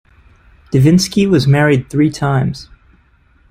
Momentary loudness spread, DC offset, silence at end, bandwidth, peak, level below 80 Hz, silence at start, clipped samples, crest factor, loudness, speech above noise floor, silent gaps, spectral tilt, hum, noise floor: 7 LU; under 0.1%; 0.85 s; 14.5 kHz; -2 dBFS; -42 dBFS; 0.7 s; under 0.1%; 14 dB; -13 LUFS; 39 dB; none; -6.5 dB/octave; none; -51 dBFS